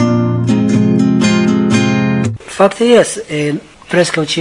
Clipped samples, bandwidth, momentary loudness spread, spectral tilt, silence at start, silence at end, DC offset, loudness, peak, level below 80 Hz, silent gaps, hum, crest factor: 0.2%; 11 kHz; 8 LU; -5.5 dB/octave; 0 s; 0 s; under 0.1%; -12 LUFS; 0 dBFS; -50 dBFS; none; none; 12 dB